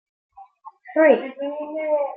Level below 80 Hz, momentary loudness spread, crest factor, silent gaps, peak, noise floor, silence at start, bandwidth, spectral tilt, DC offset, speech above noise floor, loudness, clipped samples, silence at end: -78 dBFS; 13 LU; 20 dB; none; -4 dBFS; -45 dBFS; 0.4 s; 3.7 kHz; -8.5 dB/octave; under 0.1%; 25 dB; -21 LUFS; under 0.1%; 0 s